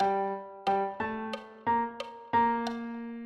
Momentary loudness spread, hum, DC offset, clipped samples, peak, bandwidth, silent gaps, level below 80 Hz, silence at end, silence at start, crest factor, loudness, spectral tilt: 11 LU; none; under 0.1%; under 0.1%; -16 dBFS; 11 kHz; none; -66 dBFS; 0 s; 0 s; 16 dB; -31 LUFS; -6 dB/octave